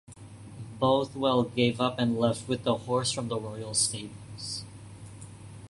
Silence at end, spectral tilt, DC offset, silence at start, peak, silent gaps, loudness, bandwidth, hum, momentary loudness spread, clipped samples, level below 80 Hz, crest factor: 0.05 s; -4.5 dB/octave; under 0.1%; 0.1 s; -10 dBFS; none; -28 LUFS; 11.5 kHz; none; 20 LU; under 0.1%; -58 dBFS; 20 dB